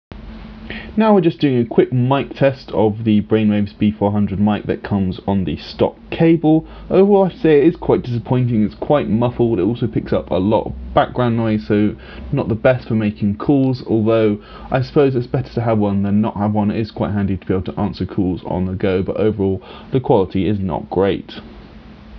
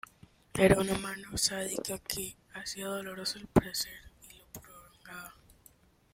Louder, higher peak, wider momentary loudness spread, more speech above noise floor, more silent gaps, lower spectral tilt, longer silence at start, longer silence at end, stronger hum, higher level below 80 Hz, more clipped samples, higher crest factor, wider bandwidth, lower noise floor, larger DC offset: first, -17 LUFS vs -32 LUFS; first, 0 dBFS vs -8 dBFS; second, 8 LU vs 23 LU; second, 22 dB vs 31 dB; neither; first, -10.5 dB/octave vs -4 dB/octave; second, 0.1 s vs 0.55 s; second, 0 s vs 0.8 s; neither; first, -38 dBFS vs -52 dBFS; neither; second, 16 dB vs 26 dB; second, 5.8 kHz vs 16.5 kHz; second, -39 dBFS vs -63 dBFS; neither